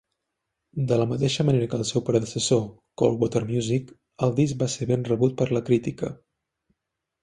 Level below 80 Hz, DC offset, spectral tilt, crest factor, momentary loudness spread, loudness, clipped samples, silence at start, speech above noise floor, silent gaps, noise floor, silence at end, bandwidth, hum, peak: -56 dBFS; under 0.1%; -6 dB/octave; 20 dB; 7 LU; -24 LUFS; under 0.1%; 0.75 s; 58 dB; none; -82 dBFS; 1.05 s; 11 kHz; none; -6 dBFS